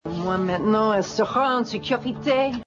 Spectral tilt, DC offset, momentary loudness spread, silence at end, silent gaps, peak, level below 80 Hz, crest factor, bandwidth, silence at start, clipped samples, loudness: -5.5 dB/octave; under 0.1%; 5 LU; 0 s; none; -10 dBFS; -54 dBFS; 14 dB; 7.8 kHz; 0.05 s; under 0.1%; -23 LUFS